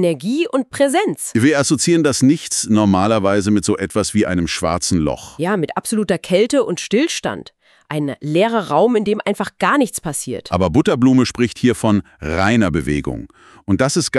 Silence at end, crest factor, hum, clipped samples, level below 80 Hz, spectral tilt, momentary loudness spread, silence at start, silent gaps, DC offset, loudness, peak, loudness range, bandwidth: 0 s; 14 dB; none; under 0.1%; -42 dBFS; -5 dB/octave; 8 LU; 0 s; none; under 0.1%; -17 LUFS; -2 dBFS; 3 LU; 13.5 kHz